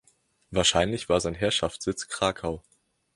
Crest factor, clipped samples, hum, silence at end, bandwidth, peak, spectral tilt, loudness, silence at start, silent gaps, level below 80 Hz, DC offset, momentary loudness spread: 22 dB; under 0.1%; none; 0.55 s; 11.5 kHz; -6 dBFS; -3.5 dB/octave; -26 LUFS; 0.5 s; none; -48 dBFS; under 0.1%; 11 LU